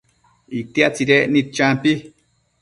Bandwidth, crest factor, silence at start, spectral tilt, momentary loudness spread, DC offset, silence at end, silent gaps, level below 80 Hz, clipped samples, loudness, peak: 11.5 kHz; 20 dB; 0.5 s; -5 dB/octave; 12 LU; under 0.1%; 0.55 s; none; -58 dBFS; under 0.1%; -17 LUFS; 0 dBFS